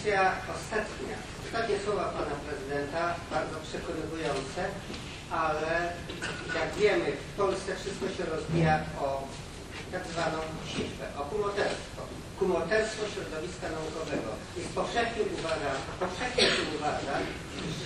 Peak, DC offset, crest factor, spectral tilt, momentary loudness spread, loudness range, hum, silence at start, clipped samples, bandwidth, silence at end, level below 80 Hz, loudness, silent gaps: -10 dBFS; under 0.1%; 22 dB; -4.5 dB/octave; 11 LU; 3 LU; none; 0 s; under 0.1%; 13 kHz; 0 s; -50 dBFS; -32 LUFS; none